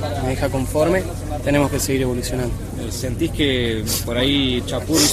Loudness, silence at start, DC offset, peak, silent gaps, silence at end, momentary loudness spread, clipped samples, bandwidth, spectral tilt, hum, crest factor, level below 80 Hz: -20 LUFS; 0 s; under 0.1%; -2 dBFS; none; 0 s; 8 LU; under 0.1%; 15 kHz; -4 dB/octave; none; 18 dB; -32 dBFS